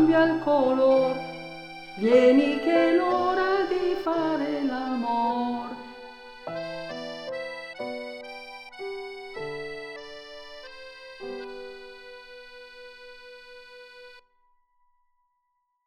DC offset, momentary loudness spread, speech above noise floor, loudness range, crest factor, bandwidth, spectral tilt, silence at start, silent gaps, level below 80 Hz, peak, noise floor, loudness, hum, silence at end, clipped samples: under 0.1%; 24 LU; 53 dB; 21 LU; 20 dB; 10 kHz; -6 dB/octave; 0 s; none; -62 dBFS; -8 dBFS; -76 dBFS; -25 LUFS; none; 1.65 s; under 0.1%